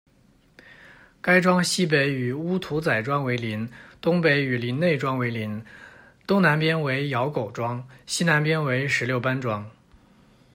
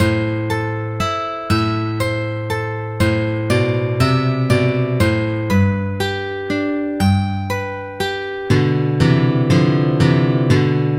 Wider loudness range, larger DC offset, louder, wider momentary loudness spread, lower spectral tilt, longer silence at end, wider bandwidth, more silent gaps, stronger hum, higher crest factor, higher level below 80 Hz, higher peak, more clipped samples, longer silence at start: about the same, 2 LU vs 3 LU; neither; second, -23 LUFS vs -18 LUFS; first, 12 LU vs 8 LU; second, -5.5 dB/octave vs -7 dB/octave; first, 0.85 s vs 0 s; about the same, 16 kHz vs 16 kHz; neither; neither; about the same, 20 dB vs 16 dB; second, -62 dBFS vs -42 dBFS; second, -4 dBFS vs 0 dBFS; neither; first, 1.25 s vs 0 s